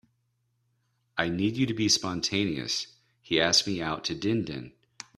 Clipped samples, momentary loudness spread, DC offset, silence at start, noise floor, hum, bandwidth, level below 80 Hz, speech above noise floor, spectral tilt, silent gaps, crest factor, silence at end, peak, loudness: under 0.1%; 14 LU; under 0.1%; 1.15 s; -74 dBFS; none; 14 kHz; -60 dBFS; 47 dB; -3.5 dB/octave; none; 22 dB; 0.5 s; -8 dBFS; -27 LUFS